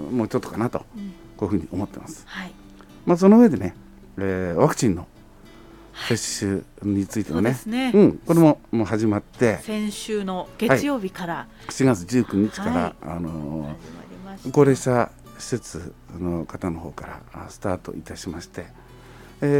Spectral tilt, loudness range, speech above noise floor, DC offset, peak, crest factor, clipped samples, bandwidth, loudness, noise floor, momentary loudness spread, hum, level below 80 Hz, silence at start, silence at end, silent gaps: -6 dB/octave; 8 LU; 24 dB; under 0.1%; -2 dBFS; 20 dB; under 0.1%; 16.5 kHz; -22 LUFS; -46 dBFS; 20 LU; none; -48 dBFS; 0 s; 0 s; none